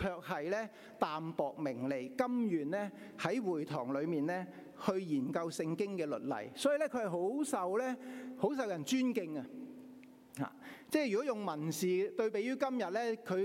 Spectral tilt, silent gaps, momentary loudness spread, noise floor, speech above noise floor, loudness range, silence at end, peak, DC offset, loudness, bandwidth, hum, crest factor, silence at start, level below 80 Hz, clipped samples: -5.5 dB/octave; none; 10 LU; -56 dBFS; 20 dB; 2 LU; 0 s; -18 dBFS; under 0.1%; -37 LUFS; 16.5 kHz; none; 18 dB; 0 s; -74 dBFS; under 0.1%